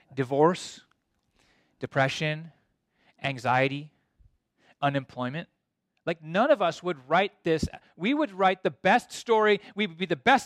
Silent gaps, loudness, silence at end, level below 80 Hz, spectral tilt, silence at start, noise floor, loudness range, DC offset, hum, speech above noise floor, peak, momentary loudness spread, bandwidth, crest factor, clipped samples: none; -27 LUFS; 0 s; -58 dBFS; -5.5 dB/octave; 0.15 s; -78 dBFS; 6 LU; under 0.1%; none; 52 dB; -8 dBFS; 11 LU; 13.5 kHz; 20 dB; under 0.1%